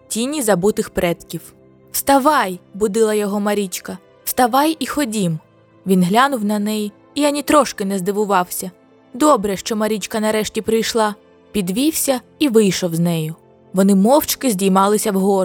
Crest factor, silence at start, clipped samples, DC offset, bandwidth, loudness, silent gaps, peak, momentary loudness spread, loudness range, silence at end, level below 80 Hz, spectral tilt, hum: 16 dB; 0.1 s; under 0.1%; under 0.1%; 20 kHz; -17 LUFS; none; 0 dBFS; 11 LU; 3 LU; 0 s; -50 dBFS; -4.5 dB/octave; none